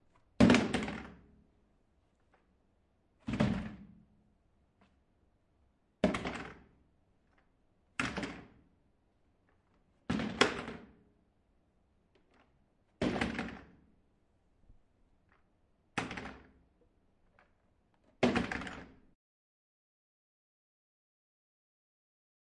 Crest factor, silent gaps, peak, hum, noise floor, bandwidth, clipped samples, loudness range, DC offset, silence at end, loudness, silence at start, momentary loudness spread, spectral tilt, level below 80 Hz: 32 dB; none; -6 dBFS; none; -73 dBFS; 11 kHz; under 0.1%; 10 LU; under 0.1%; 3.6 s; -34 LUFS; 0.4 s; 21 LU; -5.5 dB/octave; -58 dBFS